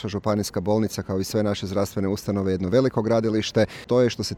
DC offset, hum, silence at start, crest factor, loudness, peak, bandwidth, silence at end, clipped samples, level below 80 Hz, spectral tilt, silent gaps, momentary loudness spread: under 0.1%; none; 0 s; 14 dB; -23 LUFS; -8 dBFS; 17.5 kHz; 0 s; under 0.1%; -52 dBFS; -6 dB/octave; none; 5 LU